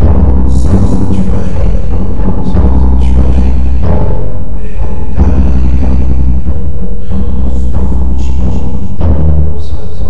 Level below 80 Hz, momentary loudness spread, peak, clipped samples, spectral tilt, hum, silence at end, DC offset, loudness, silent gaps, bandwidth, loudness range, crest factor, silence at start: -12 dBFS; 8 LU; 0 dBFS; 6%; -9.5 dB/octave; none; 0 s; 60%; -12 LUFS; none; 7 kHz; 3 LU; 14 dB; 0 s